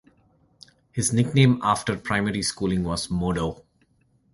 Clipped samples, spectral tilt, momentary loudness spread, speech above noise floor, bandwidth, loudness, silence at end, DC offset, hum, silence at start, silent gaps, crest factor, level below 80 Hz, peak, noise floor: under 0.1%; -5 dB/octave; 8 LU; 41 dB; 11.5 kHz; -24 LUFS; 0.8 s; under 0.1%; none; 0.95 s; none; 20 dB; -46 dBFS; -4 dBFS; -64 dBFS